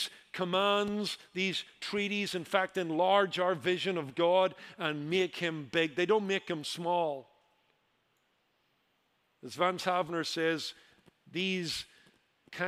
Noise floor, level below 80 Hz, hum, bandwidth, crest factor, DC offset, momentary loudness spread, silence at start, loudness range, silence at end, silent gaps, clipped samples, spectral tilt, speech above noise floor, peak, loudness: -75 dBFS; -76 dBFS; none; 15.5 kHz; 22 dB; under 0.1%; 10 LU; 0 s; 7 LU; 0 s; none; under 0.1%; -4.5 dB/octave; 43 dB; -12 dBFS; -32 LUFS